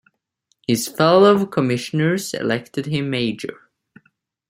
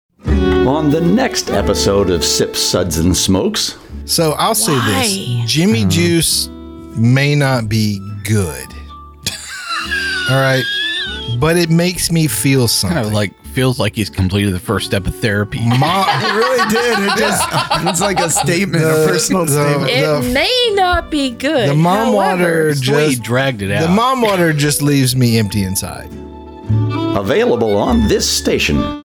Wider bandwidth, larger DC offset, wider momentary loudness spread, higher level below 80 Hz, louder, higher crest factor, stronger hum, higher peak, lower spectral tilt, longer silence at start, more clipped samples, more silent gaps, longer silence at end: second, 16 kHz vs over 20 kHz; neither; first, 12 LU vs 7 LU; second, -62 dBFS vs -32 dBFS; second, -19 LUFS vs -14 LUFS; first, 20 dB vs 10 dB; neither; first, 0 dBFS vs -4 dBFS; about the same, -5.5 dB/octave vs -4.5 dB/octave; first, 0.7 s vs 0.25 s; neither; neither; first, 0.95 s vs 0.05 s